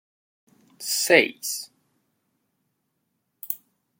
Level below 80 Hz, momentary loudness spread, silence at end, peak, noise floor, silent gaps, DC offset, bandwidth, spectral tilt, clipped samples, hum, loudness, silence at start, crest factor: -80 dBFS; 21 LU; 0.45 s; -2 dBFS; -76 dBFS; none; under 0.1%; 17 kHz; -1.5 dB/octave; under 0.1%; none; -23 LUFS; 0.8 s; 26 dB